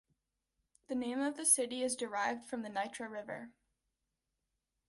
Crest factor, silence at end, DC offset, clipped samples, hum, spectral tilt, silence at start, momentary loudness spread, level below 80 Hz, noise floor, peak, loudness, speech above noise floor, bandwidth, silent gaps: 26 dB; 1.4 s; under 0.1%; under 0.1%; none; -1.5 dB/octave; 0.9 s; 16 LU; -80 dBFS; -87 dBFS; -14 dBFS; -35 LUFS; 50 dB; 11.5 kHz; none